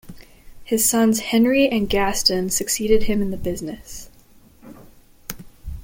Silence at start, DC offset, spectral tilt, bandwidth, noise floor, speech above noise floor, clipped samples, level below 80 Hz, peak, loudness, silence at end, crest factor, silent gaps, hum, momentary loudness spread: 0.05 s; under 0.1%; -3.5 dB/octave; 17 kHz; -50 dBFS; 31 dB; under 0.1%; -38 dBFS; -4 dBFS; -19 LUFS; 0 s; 18 dB; none; none; 21 LU